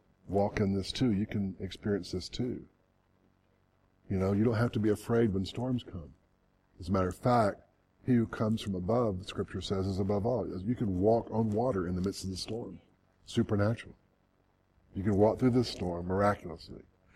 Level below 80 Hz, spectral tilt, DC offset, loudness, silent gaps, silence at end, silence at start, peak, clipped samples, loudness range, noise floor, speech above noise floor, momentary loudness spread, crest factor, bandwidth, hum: -56 dBFS; -7 dB/octave; under 0.1%; -32 LUFS; none; 0.35 s; 0.25 s; -12 dBFS; under 0.1%; 4 LU; -71 dBFS; 40 dB; 11 LU; 20 dB; 13.5 kHz; none